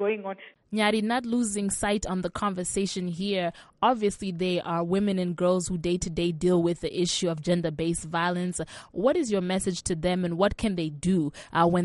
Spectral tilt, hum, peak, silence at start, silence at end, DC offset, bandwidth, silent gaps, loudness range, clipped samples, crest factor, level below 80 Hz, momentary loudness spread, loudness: -5 dB/octave; none; -10 dBFS; 0 s; 0 s; under 0.1%; 11.5 kHz; none; 1 LU; under 0.1%; 16 dB; -50 dBFS; 6 LU; -27 LUFS